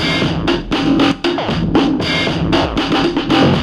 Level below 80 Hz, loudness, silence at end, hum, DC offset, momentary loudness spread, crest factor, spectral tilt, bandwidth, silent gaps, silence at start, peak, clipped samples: -32 dBFS; -15 LUFS; 0 s; none; under 0.1%; 4 LU; 14 dB; -6 dB/octave; 11.5 kHz; none; 0 s; 0 dBFS; under 0.1%